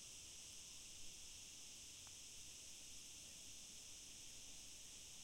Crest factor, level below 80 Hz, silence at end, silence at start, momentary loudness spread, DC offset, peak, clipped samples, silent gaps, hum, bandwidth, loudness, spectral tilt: 16 dB; -72 dBFS; 0 s; 0 s; 1 LU; under 0.1%; -42 dBFS; under 0.1%; none; none; 16.5 kHz; -55 LUFS; 0 dB/octave